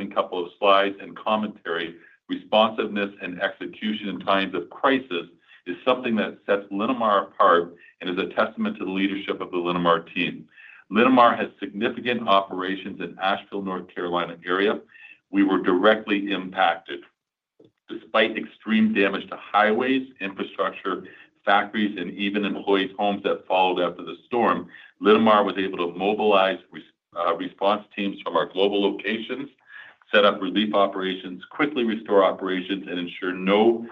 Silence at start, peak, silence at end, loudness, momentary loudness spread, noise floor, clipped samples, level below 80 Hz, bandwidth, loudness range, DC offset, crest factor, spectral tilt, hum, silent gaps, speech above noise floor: 0 s; -2 dBFS; 0 s; -23 LUFS; 12 LU; -77 dBFS; under 0.1%; -72 dBFS; 5.8 kHz; 4 LU; under 0.1%; 20 dB; -7.5 dB/octave; none; none; 54 dB